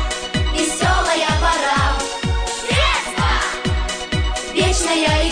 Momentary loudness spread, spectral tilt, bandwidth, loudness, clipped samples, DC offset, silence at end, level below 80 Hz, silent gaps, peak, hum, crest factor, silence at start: 5 LU; -3.5 dB/octave; 10 kHz; -18 LUFS; under 0.1%; under 0.1%; 0 s; -24 dBFS; none; -4 dBFS; none; 14 dB; 0 s